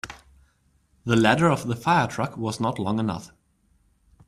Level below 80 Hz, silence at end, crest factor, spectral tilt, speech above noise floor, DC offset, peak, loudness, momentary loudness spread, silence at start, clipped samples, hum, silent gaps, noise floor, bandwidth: -56 dBFS; 1 s; 22 dB; -6 dB/octave; 42 dB; under 0.1%; -4 dBFS; -23 LUFS; 14 LU; 0.05 s; under 0.1%; none; none; -65 dBFS; 14.5 kHz